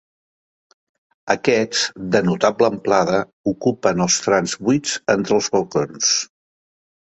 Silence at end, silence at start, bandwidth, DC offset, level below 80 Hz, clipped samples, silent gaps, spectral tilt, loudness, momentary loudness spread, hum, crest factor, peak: 0.85 s; 1.25 s; 8.4 kHz; under 0.1%; -56 dBFS; under 0.1%; 3.33-3.44 s; -3.5 dB/octave; -19 LUFS; 4 LU; none; 18 dB; -2 dBFS